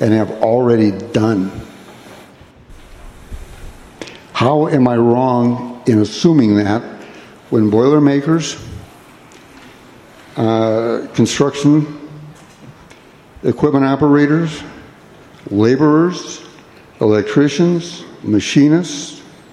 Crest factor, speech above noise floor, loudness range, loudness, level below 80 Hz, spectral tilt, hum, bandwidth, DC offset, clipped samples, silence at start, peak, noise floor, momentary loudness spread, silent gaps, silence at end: 16 dB; 29 dB; 5 LU; -14 LUFS; -44 dBFS; -6.5 dB/octave; none; 11.5 kHz; under 0.1%; under 0.1%; 0 s; 0 dBFS; -42 dBFS; 22 LU; none; 0.3 s